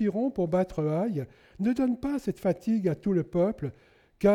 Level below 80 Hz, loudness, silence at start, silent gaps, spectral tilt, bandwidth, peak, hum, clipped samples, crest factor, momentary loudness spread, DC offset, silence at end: -54 dBFS; -29 LUFS; 0 s; none; -9 dB/octave; 14 kHz; -12 dBFS; none; under 0.1%; 16 dB; 6 LU; under 0.1%; 0 s